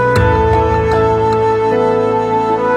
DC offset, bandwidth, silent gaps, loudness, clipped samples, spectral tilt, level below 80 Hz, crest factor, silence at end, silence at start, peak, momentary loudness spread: under 0.1%; 9.6 kHz; none; -13 LUFS; under 0.1%; -7.5 dB/octave; -26 dBFS; 12 dB; 0 s; 0 s; 0 dBFS; 2 LU